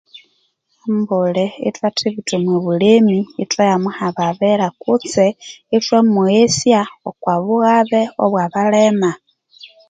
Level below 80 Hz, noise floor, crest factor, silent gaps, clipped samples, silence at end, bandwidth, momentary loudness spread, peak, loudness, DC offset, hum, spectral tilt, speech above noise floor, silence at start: -60 dBFS; -63 dBFS; 16 dB; none; under 0.1%; 0.25 s; 9.4 kHz; 8 LU; 0 dBFS; -15 LUFS; under 0.1%; none; -5.5 dB/octave; 48 dB; 0.15 s